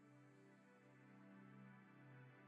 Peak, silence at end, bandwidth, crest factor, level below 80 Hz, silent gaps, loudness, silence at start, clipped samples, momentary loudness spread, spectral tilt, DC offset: -52 dBFS; 0 s; 8.2 kHz; 12 dB; under -90 dBFS; none; -66 LUFS; 0 s; under 0.1%; 5 LU; -7.5 dB/octave; under 0.1%